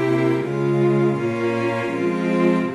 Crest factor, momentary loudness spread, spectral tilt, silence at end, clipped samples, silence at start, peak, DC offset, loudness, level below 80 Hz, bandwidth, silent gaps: 14 dB; 4 LU; -8 dB/octave; 0 s; under 0.1%; 0 s; -6 dBFS; under 0.1%; -20 LUFS; -62 dBFS; 11 kHz; none